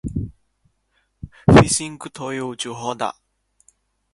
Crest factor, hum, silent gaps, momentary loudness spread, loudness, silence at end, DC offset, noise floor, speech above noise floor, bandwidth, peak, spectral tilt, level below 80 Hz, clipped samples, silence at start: 22 dB; none; none; 21 LU; -19 LUFS; 1.05 s; under 0.1%; -67 dBFS; 49 dB; 11.5 kHz; 0 dBFS; -5 dB/octave; -38 dBFS; under 0.1%; 0.05 s